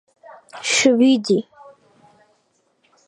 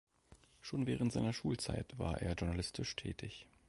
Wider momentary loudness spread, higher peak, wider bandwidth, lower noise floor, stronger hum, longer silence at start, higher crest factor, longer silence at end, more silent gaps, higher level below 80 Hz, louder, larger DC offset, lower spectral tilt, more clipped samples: first, 13 LU vs 9 LU; first, -2 dBFS vs -24 dBFS; about the same, 11.5 kHz vs 11.5 kHz; about the same, -65 dBFS vs -66 dBFS; neither; first, 0.55 s vs 0.3 s; about the same, 18 dB vs 18 dB; first, 1.65 s vs 0.25 s; neither; second, -70 dBFS vs -52 dBFS; first, -17 LUFS vs -40 LUFS; neither; second, -3 dB/octave vs -5.5 dB/octave; neither